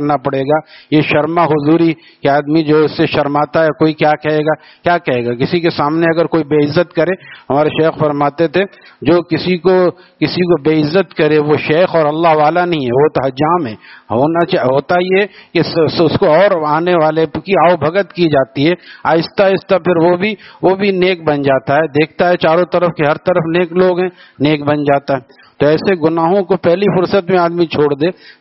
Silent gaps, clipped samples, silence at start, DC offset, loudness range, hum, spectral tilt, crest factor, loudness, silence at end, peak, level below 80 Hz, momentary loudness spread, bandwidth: none; under 0.1%; 0 s; under 0.1%; 2 LU; none; -5 dB/octave; 12 dB; -13 LUFS; 0.1 s; 0 dBFS; -50 dBFS; 5 LU; 6 kHz